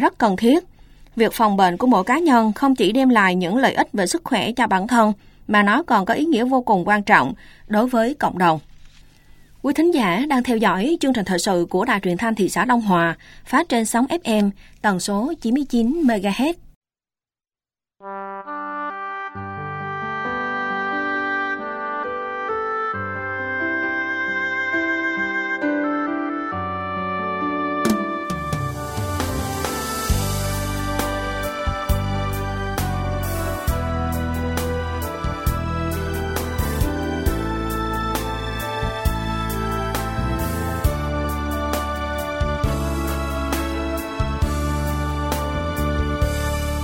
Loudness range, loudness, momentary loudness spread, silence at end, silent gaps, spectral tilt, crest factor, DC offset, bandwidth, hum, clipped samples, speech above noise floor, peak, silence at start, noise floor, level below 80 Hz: 7 LU; -21 LUFS; 9 LU; 0 s; 16.76-16.81 s; -5.5 dB/octave; 20 dB; under 0.1%; 16.5 kHz; none; under 0.1%; over 72 dB; 0 dBFS; 0 s; under -90 dBFS; -32 dBFS